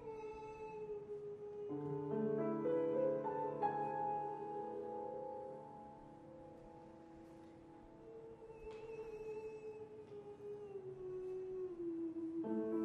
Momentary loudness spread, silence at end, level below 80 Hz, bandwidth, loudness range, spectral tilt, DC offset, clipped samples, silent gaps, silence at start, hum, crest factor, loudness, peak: 19 LU; 0 s; -74 dBFS; 8.4 kHz; 14 LU; -9 dB/octave; under 0.1%; under 0.1%; none; 0 s; none; 18 dB; -44 LUFS; -26 dBFS